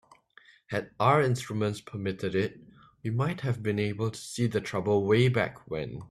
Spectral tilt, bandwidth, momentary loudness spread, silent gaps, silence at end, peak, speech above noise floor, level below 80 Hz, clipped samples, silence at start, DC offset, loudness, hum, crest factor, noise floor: -6.5 dB/octave; 13.5 kHz; 11 LU; none; 0.05 s; -10 dBFS; 31 dB; -62 dBFS; under 0.1%; 0.7 s; under 0.1%; -29 LUFS; none; 20 dB; -59 dBFS